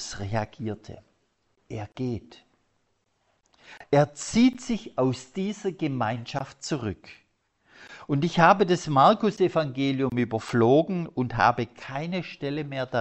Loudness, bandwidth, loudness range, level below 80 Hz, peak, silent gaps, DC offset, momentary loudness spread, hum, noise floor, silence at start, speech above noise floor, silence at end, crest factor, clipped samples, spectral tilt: -25 LUFS; 8.4 kHz; 11 LU; -56 dBFS; -4 dBFS; none; under 0.1%; 15 LU; none; -72 dBFS; 0 s; 47 dB; 0 s; 22 dB; under 0.1%; -6 dB/octave